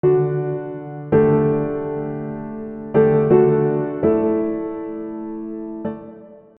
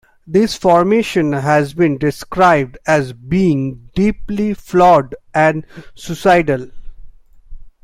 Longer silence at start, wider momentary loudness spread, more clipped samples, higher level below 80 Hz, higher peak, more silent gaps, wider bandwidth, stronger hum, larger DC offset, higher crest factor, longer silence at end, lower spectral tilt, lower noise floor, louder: second, 0.05 s vs 0.25 s; first, 16 LU vs 8 LU; neither; second, -52 dBFS vs -38 dBFS; about the same, -2 dBFS vs 0 dBFS; neither; second, 3.6 kHz vs 16 kHz; neither; neither; about the same, 18 dB vs 14 dB; about the same, 0.2 s vs 0.15 s; first, -13 dB/octave vs -6.5 dB/octave; first, -41 dBFS vs -36 dBFS; second, -20 LUFS vs -15 LUFS